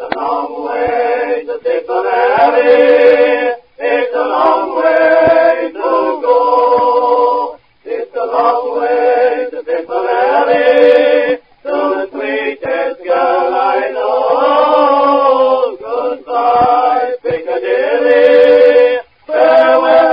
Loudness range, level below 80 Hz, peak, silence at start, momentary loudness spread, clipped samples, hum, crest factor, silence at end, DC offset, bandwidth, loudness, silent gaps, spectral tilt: 3 LU; -54 dBFS; 0 dBFS; 0 s; 10 LU; 0.1%; none; 12 dB; 0 s; 0.2%; 5.4 kHz; -11 LUFS; none; -6.5 dB/octave